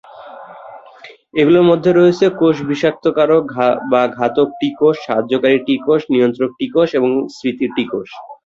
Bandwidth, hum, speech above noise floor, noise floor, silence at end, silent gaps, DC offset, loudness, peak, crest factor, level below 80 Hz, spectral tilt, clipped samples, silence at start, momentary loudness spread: 7.6 kHz; none; 26 dB; -40 dBFS; 0.1 s; none; under 0.1%; -15 LUFS; 0 dBFS; 14 dB; -58 dBFS; -7 dB/octave; under 0.1%; 0.15 s; 11 LU